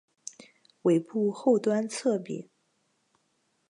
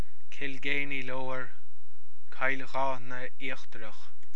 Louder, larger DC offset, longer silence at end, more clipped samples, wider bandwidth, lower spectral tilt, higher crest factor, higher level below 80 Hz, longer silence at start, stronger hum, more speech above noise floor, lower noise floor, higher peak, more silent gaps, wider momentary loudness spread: first, -27 LUFS vs -35 LUFS; second, under 0.1% vs 10%; first, 1.25 s vs 0.25 s; neither; about the same, 11.5 kHz vs 11 kHz; about the same, -6 dB/octave vs -5.5 dB/octave; second, 16 dB vs 24 dB; second, -86 dBFS vs -72 dBFS; first, 0.85 s vs 0.3 s; neither; first, 47 dB vs 30 dB; first, -74 dBFS vs -66 dBFS; about the same, -14 dBFS vs -12 dBFS; neither; about the same, 19 LU vs 17 LU